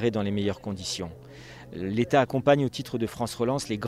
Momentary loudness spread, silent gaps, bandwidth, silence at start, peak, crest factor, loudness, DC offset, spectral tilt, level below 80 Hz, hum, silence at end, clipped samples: 18 LU; none; 16 kHz; 0 s; -8 dBFS; 20 dB; -27 LUFS; under 0.1%; -5.5 dB/octave; -56 dBFS; none; 0 s; under 0.1%